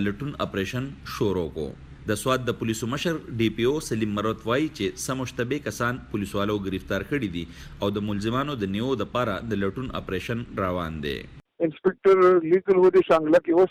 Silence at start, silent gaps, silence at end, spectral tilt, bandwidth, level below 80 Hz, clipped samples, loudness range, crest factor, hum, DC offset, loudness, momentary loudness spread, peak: 0 s; none; 0 s; -6 dB/octave; 15.5 kHz; -48 dBFS; under 0.1%; 6 LU; 14 dB; none; under 0.1%; -25 LUFS; 12 LU; -10 dBFS